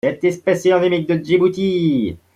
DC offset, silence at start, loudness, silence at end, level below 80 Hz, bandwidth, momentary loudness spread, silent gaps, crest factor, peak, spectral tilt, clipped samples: under 0.1%; 0.05 s; -17 LUFS; 0.2 s; -54 dBFS; 11 kHz; 4 LU; none; 14 dB; -4 dBFS; -6.5 dB/octave; under 0.1%